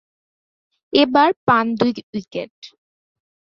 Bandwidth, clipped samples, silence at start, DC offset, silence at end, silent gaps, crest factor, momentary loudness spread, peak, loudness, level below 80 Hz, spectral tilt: 7 kHz; under 0.1%; 0.95 s; under 0.1%; 0.75 s; 1.36-1.47 s, 2.03-2.13 s, 2.50-2.62 s; 18 dB; 15 LU; -2 dBFS; -17 LUFS; -62 dBFS; -6.5 dB/octave